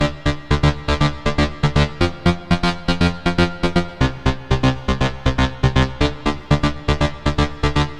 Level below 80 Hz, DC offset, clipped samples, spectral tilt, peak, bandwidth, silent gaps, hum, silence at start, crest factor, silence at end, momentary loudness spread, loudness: -26 dBFS; under 0.1%; under 0.1%; -6 dB/octave; -2 dBFS; 11 kHz; none; none; 0 s; 16 dB; 0 s; 3 LU; -19 LUFS